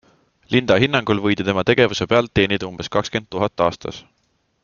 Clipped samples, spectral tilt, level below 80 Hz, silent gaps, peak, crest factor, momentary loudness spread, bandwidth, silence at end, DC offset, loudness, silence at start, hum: under 0.1%; -5.5 dB/octave; -48 dBFS; none; -2 dBFS; 18 dB; 8 LU; 7.2 kHz; 0.65 s; under 0.1%; -19 LUFS; 0.5 s; none